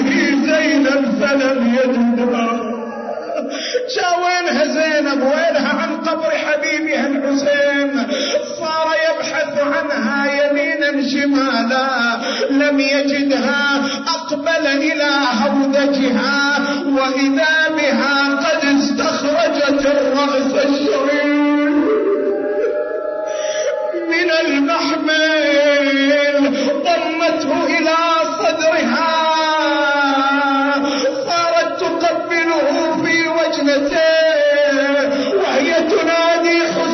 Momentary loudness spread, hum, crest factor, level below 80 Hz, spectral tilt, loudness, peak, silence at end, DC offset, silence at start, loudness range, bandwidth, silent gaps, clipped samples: 5 LU; none; 10 dB; -56 dBFS; -3.5 dB/octave; -15 LUFS; -6 dBFS; 0 s; under 0.1%; 0 s; 3 LU; 6.4 kHz; none; under 0.1%